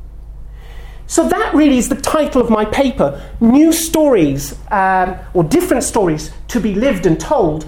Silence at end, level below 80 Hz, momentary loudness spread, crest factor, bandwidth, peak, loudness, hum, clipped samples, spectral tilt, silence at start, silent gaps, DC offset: 0 s; -32 dBFS; 7 LU; 14 dB; 17.5 kHz; 0 dBFS; -14 LUFS; none; under 0.1%; -5 dB/octave; 0 s; none; under 0.1%